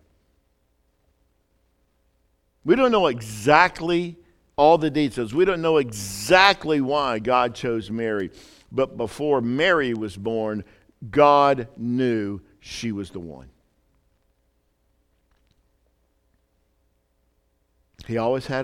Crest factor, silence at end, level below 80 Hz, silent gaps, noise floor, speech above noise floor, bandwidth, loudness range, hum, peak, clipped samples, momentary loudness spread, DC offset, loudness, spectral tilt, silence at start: 24 dB; 0 s; -54 dBFS; none; -68 dBFS; 47 dB; 16.5 kHz; 12 LU; none; 0 dBFS; under 0.1%; 16 LU; under 0.1%; -21 LUFS; -5 dB/octave; 2.65 s